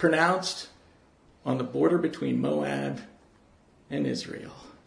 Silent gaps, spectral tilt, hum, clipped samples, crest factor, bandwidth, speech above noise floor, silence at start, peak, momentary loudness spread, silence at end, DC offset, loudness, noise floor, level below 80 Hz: none; -5.5 dB/octave; none; under 0.1%; 22 dB; 10.5 kHz; 32 dB; 0 s; -8 dBFS; 16 LU; 0.15 s; under 0.1%; -28 LUFS; -59 dBFS; -66 dBFS